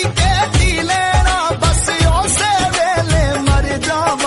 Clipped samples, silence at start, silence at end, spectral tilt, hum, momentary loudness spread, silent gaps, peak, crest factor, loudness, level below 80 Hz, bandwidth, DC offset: under 0.1%; 0 s; 0 s; -4 dB/octave; none; 2 LU; none; -2 dBFS; 12 dB; -14 LUFS; -20 dBFS; 11.5 kHz; under 0.1%